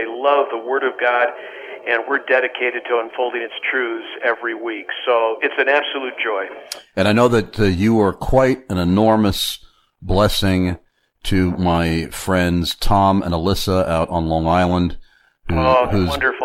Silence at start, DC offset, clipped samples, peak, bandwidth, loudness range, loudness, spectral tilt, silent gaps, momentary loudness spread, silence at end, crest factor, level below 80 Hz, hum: 0 s; under 0.1%; under 0.1%; -2 dBFS; 16.5 kHz; 3 LU; -18 LUFS; -5.5 dB/octave; none; 9 LU; 0 s; 16 dB; -34 dBFS; none